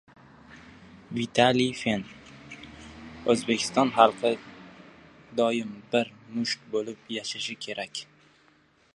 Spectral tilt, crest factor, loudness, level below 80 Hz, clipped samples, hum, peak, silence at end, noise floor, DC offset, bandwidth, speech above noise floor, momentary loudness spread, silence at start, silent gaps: -4 dB/octave; 26 dB; -27 LUFS; -62 dBFS; under 0.1%; none; -2 dBFS; 0.9 s; -62 dBFS; under 0.1%; 11.5 kHz; 36 dB; 23 LU; 0.5 s; none